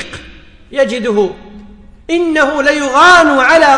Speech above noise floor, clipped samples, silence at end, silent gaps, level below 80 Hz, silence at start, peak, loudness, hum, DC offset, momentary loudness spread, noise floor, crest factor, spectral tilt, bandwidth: 27 dB; under 0.1%; 0 s; none; -40 dBFS; 0 s; 0 dBFS; -10 LUFS; none; under 0.1%; 15 LU; -36 dBFS; 12 dB; -3 dB/octave; 10.5 kHz